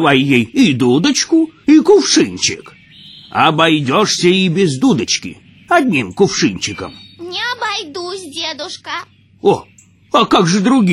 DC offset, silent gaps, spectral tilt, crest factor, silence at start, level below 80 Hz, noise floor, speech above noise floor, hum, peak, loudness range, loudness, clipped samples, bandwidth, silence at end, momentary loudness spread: under 0.1%; none; -4 dB/octave; 14 dB; 0 s; -54 dBFS; -39 dBFS; 26 dB; none; 0 dBFS; 8 LU; -13 LUFS; under 0.1%; 13 kHz; 0 s; 14 LU